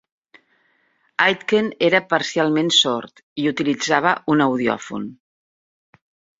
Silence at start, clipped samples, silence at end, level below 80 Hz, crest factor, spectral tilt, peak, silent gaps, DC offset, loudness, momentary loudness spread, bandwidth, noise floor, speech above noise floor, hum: 1.2 s; under 0.1%; 1.25 s; -64 dBFS; 20 dB; -3.5 dB/octave; -2 dBFS; 3.23-3.36 s; under 0.1%; -19 LUFS; 14 LU; 7.8 kHz; -64 dBFS; 44 dB; none